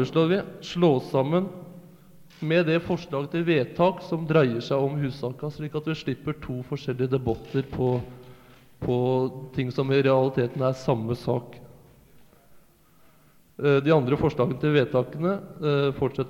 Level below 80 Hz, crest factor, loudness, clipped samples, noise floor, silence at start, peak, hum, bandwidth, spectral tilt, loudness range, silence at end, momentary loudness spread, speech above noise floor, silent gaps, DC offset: -54 dBFS; 18 dB; -25 LUFS; under 0.1%; -58 dBFS; 0 s; -8 dBFS; none; 16 kHz; -8 dB/octave; 5 LU; 0 s; 10 LU; 33 dB; none; under 0.1%